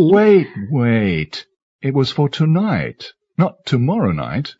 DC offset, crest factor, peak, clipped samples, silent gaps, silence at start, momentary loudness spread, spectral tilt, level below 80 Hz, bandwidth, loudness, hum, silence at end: under 0.1%; 14 dB; -2 dBFS; under 0.1%; 1.62-1.79 s; 0 s; 14 LU; -8 dB/octave; -48 dBFS; 7.8 kHz; -17 LUFS; none; 0.1 s